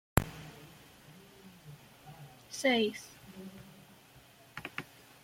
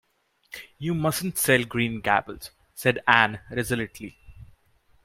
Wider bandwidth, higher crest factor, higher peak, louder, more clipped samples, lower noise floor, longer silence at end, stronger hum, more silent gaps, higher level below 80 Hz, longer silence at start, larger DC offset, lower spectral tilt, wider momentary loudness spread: about the same, 16.5 kHz vs 16 kHz; first, 32 dB vs 26 dB; second, -6 dBFS vs 0 dBFS; second, -34 LUFS vs -24 LUFS; neither; second, -59 dBFS vs -64 dBFS; second, 0.4 s vs 0.6 s; neither; neither; about the same, -52 dBFS vs -54 dBFS; second, 0.15 s vs 0.55 s; neither; about the same, -4.5 dB/octave vs -4 dB/octave; first, 25 LU vs 22 LU